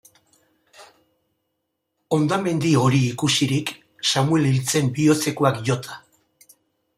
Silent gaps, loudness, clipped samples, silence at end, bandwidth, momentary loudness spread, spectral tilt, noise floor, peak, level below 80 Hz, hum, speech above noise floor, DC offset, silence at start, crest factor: none; -20 LUFS; under 0.1%; 1 s; 16 kHz; 7 LU; -5 dB/octave; -77 dBFS; -2 dBFS; -60 dBFS; none; 57 dB; under 0.1%; 0.8 s; 20 dB